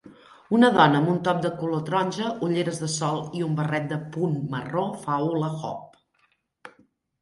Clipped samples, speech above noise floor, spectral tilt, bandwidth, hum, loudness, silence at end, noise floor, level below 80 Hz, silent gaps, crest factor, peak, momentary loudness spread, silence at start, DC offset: under 0.1%; 44 dB; -6 dB/octave; 11.5 kHz; none; -25 LUFS; 0.55 s; -68 dBFS; -66 dBFS; none; 22 dB; -4 dBFS; 10 LU; 0.05 s; under 0.1%